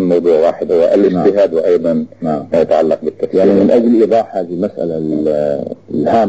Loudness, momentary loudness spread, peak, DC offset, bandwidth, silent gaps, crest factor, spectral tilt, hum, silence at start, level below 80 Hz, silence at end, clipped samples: -13 LUFS; 9 LU; -2 dBFS; 0.4%; 8 kHz; none; 12 dB; -8.5 dB/octave; none; 0 s; -50 dBFS; 0 s; under 0.1%